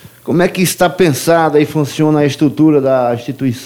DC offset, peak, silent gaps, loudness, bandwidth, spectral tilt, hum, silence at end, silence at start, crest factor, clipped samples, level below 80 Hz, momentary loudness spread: under 0.1%; 0 dBFS; none; -12 LUFS; 17 kHz; -5.5 dB/octave; none; 0 s; 0.05 s; 12 dB; under 0.1%; -50 dBFS; 6 LU